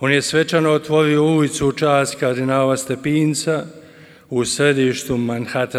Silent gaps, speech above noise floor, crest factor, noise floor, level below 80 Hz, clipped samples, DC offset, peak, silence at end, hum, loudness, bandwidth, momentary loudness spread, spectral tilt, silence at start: none; 27 dB; 16 dB; -44 dBFS; -50 dBFS; under 0.1%; under 0.1%; -2 dBFS; 0 s; none; -18 LUFS; 15.5 kHz; 6 LU; -5 dB/octave; 0 s